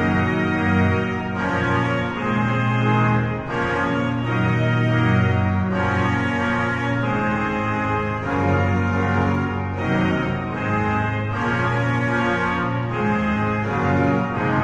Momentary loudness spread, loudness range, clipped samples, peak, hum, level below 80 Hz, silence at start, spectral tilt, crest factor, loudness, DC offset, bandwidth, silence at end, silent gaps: 4 LU; 1 LU; under 0.1%; -6 dBFS; none; -42 dBFS; 0 s; -7.5 dB/octave; 14 dB; -21 LUFS; under 0.1%; 8 kHz; 0 s; none